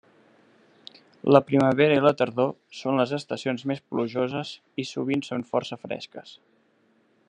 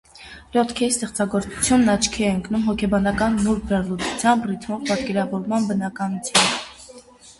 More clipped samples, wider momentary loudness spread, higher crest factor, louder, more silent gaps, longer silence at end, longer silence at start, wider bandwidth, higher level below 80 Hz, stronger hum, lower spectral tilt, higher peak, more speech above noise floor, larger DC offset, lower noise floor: neither; first, 15 LU vs 9 LU; about the same, 24 dB vs 20 dB; second, -25 LUFS vs -21 LUFS; neither; first, 0.95 s vs 0.1 s; first, 1.25 s vs 0.15 s; second, 9.6 kHz vs 11.5 kHz; second, -72 dBFS vs -44 dBFS; neither; first, -6.5 dB/octave vs -4 dB/octave; about the same, -2 dBFS vs -2 dBFS; first, 40 dB vs 24 dB; neither; first, -65 dBFS vs -45 dBFS